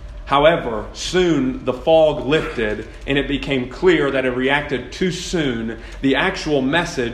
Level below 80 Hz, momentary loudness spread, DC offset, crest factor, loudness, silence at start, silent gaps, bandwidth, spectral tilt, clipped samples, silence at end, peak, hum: -36 dBFS; 9 LU; under 0.1%; 18 dB; -19 LUFS; 0 s; none; 12.5 kHz; -5 dB/octave; under 0.1%; 0 s; 0 dBFS; none